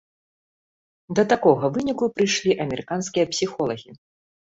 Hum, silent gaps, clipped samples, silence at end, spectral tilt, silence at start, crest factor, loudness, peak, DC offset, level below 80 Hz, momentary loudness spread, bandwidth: none; none; under 0.1%; 0.65 s; -4.5 dB/octave; 1.1 s; 22 dB; -22 LUFS; -2 dBFS; under 0.1%; -60 dBFS; 9 LU; 8 kHz